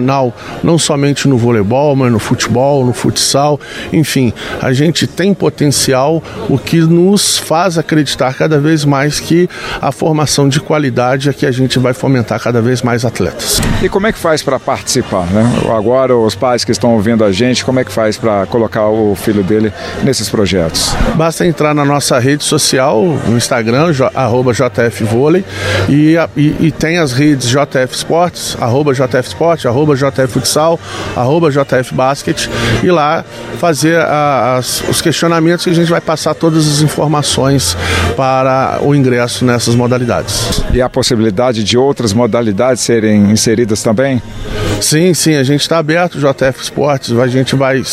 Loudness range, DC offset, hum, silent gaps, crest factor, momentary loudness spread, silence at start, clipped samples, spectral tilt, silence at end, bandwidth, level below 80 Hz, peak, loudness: 2 LU; under 0.1%; none; none; 10 dB; 4 LU; 0 s; under 0.1%; -5 dB/octave; 0 s; 15.5 kHz; -32 dBFS; 0 dBFS; -11 LUFS